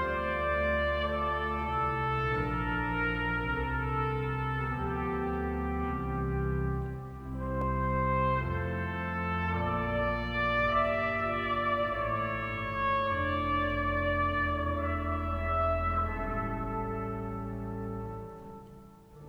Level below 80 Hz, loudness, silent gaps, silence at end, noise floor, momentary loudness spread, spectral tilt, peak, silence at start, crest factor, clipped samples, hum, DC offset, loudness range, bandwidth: -40 dBFS; -31 LUFS; none; 0 s; -52 dBFS; 8 LU; -8 dB/octave; -16 dBFS; 0 s; 16 dB; under 0.1%; none; under 0.1%; 3 LU; 9 kHz